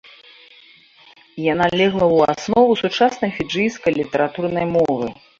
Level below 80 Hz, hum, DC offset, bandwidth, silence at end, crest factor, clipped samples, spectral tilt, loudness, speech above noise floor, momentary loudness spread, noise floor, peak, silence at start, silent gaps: -52 dBFS; none; under 0.1%; 7.6 kHz; 0.25 s; 16 dB; under 0.1%; -5.5 dB/octave; -18 LUFS; 32 dB; 7 LU; -49 dBFS; -2 dBFS; 1.35 s; none